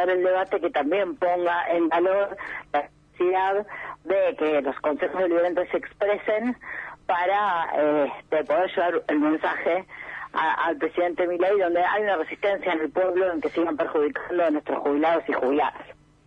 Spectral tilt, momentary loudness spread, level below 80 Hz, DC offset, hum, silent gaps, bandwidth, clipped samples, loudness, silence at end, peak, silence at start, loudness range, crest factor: -6.5 dB/octave; 7 LU; -62 dBFS; under 0.1%; none; none; 6.6 kHz; under 0.1%; -24 LUFS; 0.35 s; -12 dBFS; 0 s; 1 LU; 12 dB